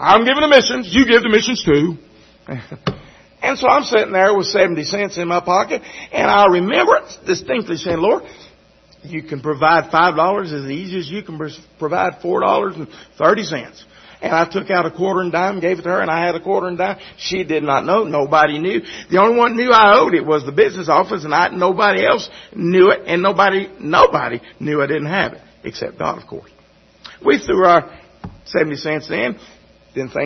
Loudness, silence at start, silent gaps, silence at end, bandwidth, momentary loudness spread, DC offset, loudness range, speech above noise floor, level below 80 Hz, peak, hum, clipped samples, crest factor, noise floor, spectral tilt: -16 LUFS; 0 s; none; 0 s; 6.4 kHz; 15 LU; under 0.1%; 5 LU; 35 dB; -50 dBFS; 0 dBFS; none; under 0.1%; 16 dB; -50 dBFS; -5 dB/octave